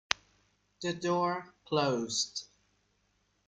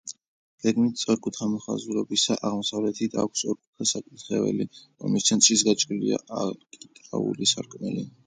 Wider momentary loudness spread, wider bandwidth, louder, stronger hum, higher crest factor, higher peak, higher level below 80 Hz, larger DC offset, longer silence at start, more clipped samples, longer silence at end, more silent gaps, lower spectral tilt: second, 9 LU vs 12 LU; about the same, 9.6 kHz vs 9.6 kHz; second, -33 LUFS vs -25 LUFS; first, 50 Hz at -70 dBFS vs none; first, 34 dB vs 22 dB; about the same, -2 dBFS vs -4 dBFS; about the same, -72 dBFS vs -68 dBFS; neither; about the same, 0.1 s vs 0.05 s; neither; first, 1 s vs 0.15 s; second, none vs 0.28-0.58 s, 3.67-3.73 s; about the same, -3.5 dB/octave vs -3 dB/octave